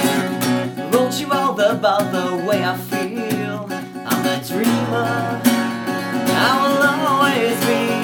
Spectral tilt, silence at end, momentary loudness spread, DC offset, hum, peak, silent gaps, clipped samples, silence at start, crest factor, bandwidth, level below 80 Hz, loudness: -4.5 dB/octave; 0 s; 7 LU; under 0.1%; none; 0 dBFS; none; under 0.1%; 0 s; 18 dB; 19.5 kHz; -64 dBFS; -18 LUFS